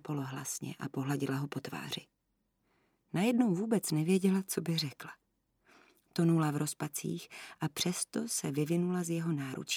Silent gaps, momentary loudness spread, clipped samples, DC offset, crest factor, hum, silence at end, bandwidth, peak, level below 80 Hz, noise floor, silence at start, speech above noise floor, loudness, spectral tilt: none; 11 LU; under 0.1%; under 0.1%; 18 dB; none; 0 s; 18 kHz; -16 dBFS; -78 dBFS; -80 dBFS; 0.05 s; 46 dB; -34 LUFS; -5 dB/octave